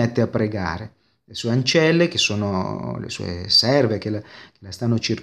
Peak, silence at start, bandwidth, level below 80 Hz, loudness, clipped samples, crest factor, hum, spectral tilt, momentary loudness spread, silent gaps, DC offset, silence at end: -4 dBFS; 0 s; 13.5 kHz; -52 dBFS; -20 LUFS; under 0.1%; 18 dB; none; -5 dB/octave; 14 LU; none; under 0.1%; 0 s